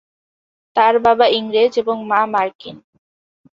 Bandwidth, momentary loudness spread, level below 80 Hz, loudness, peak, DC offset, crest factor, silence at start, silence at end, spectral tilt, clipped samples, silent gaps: 7.2 kHz; 11 LU; -58 dBFS; -16 LUFS; -2 dBFS; under 0.1%; 16 dB; 0.75 s; 0.85 s; -5 dB/octave; under 0.1%; 2.55-2.59 s